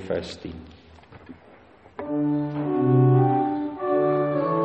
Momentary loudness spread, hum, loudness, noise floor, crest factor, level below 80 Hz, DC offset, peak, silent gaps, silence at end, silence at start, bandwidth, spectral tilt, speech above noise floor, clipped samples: 19 LU; none; -23 LUFS; -51 dBFS; 16 dB; -58 dBFS; under 0.1%; -8 dBFS; none; 0 s; 0 s; 7.8 kHz; -9.5 dB/octave; 24 dB; under 0.1%